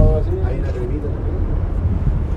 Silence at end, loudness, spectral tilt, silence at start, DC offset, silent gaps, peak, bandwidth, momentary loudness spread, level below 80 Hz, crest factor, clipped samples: 0 s; -21 LUFS; -10 dB/octave; 0 s; under 0.1%; none; 0 dBFS; 4.9 kHz; 4 LU; -20 dBFS; 18 dB; under 0.1%